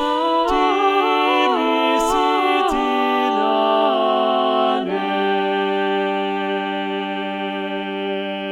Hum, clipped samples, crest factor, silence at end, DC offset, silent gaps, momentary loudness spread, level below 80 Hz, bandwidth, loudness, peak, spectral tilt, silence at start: none; under 0.1%; 14 dB; 0 s; under 0.1%; none; 8 LU; -46 dBFS; 14 kHz; -19 LUFS; -4 dBFS; -4.5 dB/octave; 0 s